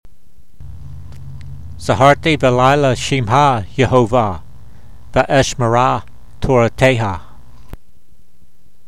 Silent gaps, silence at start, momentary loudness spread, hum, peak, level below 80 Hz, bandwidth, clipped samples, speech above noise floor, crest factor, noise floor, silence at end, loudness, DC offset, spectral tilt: none; 0.6 s; 22 LU; none; 0 dBFS; -36 dBFS; 13.5 kHz; under 0.1%; 41 dB; 16 dB; -54 dBFS; 1.15 s; -14 LUFS; 3%; -5.5 dB/octave